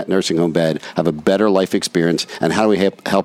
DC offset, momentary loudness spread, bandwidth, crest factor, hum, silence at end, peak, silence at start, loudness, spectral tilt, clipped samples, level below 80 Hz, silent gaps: under 0.1%; 4 LU; 15.5 kHz; 16 dB; none; 0 s; -2 dBFS; 0 s; -17 LUFS; -5 dB/octave; under 0.1%; -54 dBFS; none